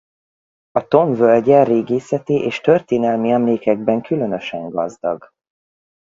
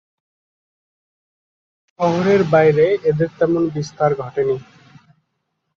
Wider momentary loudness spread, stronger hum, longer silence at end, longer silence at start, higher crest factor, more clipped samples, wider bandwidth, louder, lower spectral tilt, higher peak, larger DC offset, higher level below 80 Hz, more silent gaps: first, 11 LU vs 8 LU; neither; second, 0.95 s vs 1.15 s; second, 0.75 s vs 2 s; about the same, 18 dB vs 18 dB; neither; about the same, 7.6 kHz vs 7.4 kHz; about the same, -17 LUFS vs -17 LUFS; about the same, -7.5 dB/octave vs -7.5 dB/octave; about the same, 0 dBFS vs -2 dBFS; neither; about the same, -60 dBFS vs -56 dBFS; neither